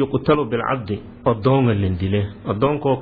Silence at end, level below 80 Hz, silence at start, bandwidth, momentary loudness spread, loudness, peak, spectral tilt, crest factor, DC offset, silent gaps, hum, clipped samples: 0 s; -44 dBFS; 0 s; 4.9 kHz; 7 LU; -20 LUFS; -4 dBFS; -11 dB/octave; 14 dB; under 0.1%; none; none; under 0.1%